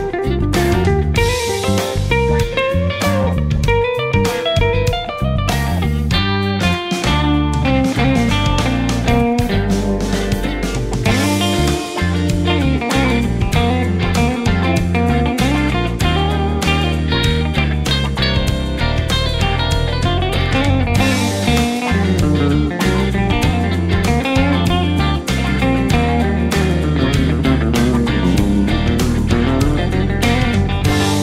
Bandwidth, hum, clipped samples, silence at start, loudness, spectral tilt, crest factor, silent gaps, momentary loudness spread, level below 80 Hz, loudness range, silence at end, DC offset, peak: 16 kHz; none; under 0.1%; 0 s; -16 LUFS; -5.5 dB/octave; 14 dB; none; 3 LU; -22 dBFS; 1 LU; 0 s; under 0.1%; 0 dBFS